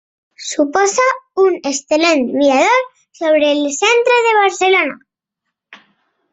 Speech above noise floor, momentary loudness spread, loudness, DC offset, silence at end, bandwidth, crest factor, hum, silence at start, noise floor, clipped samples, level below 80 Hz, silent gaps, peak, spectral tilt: 64 dB; 9 LU; -14 LUFS; under 0.1%; 0.6 s; 8.4 kHz; 12 dB; none; 0.4 s; -77 dBFS; under 0.1%; -62 dBFS; none; -2 dBFS; -1.5 dB/octave